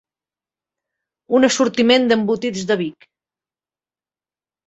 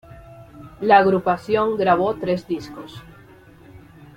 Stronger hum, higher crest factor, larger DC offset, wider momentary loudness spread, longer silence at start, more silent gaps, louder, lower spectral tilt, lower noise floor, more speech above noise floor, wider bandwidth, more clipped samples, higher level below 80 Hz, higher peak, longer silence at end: neither; about the same, 20 dB vs 20 dB; neither; second, 8 LU vs 22 LU; first, 1.3 s vs 0.1 s; neither; about the same, -17 LUFS vs -19 LUFS; second, -4 dB/octave vs -7 dB/octave; first, under -90 dBFS vs -47 dBFS; first, over 73 dB vs 28 dB; second, 8.2 kHz vs 15.5 kHz; neither; second, -62 dBFS vs -52 dBFS; about the same, 0 dBFS vs -2 dBFS; first, 1.75 s vs 0.4 s